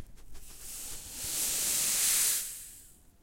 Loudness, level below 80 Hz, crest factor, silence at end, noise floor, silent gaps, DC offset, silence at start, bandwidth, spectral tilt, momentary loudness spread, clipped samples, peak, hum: -28 LUFS; -54 dBFS; 20 dB; 0.3 s; -55 dBFS; none; under 0.1%; 0 s; 16.5 kHz; 1.5 dB/octave; 19 LU; under 0.1%; -14 dBFS; none